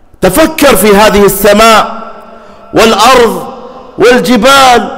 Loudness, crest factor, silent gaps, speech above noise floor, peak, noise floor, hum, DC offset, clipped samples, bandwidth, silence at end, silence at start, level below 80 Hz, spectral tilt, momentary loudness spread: -4 LUFS; 6 dB; none; 26 dB; 0 dBFS; -30 dBFS; none; under 0.1%; 0.5%; 16.5 kHz; 0 s; 0.2 s; -28 dBFS; -3.5 dB/octave; 11 LU